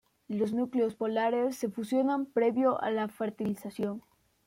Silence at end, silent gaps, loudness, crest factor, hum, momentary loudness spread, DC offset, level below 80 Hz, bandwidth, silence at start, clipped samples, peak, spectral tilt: 0.45 s; none; -31 LUFS; 16 dB; none; 8 LU; under 0.1%; -74 dBFS; 16.5 kHz; 0.3 s; under 0.1%; -16 dBFS; -6.5 dB/octave